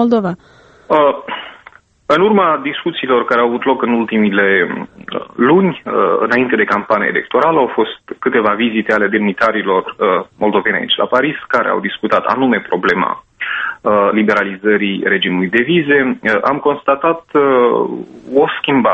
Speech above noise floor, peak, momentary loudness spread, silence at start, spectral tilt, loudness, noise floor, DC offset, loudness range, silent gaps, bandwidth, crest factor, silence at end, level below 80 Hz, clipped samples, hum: 30 dB; 0 dBFS; 8 LU; 0 s; -7 dB/octave; -14 LUFS; -43 dBFS; under 0.1%; 1 LU; none; 7.8 kHz; 14 dB; 0 s; -54 dBFS; under 0.1%; none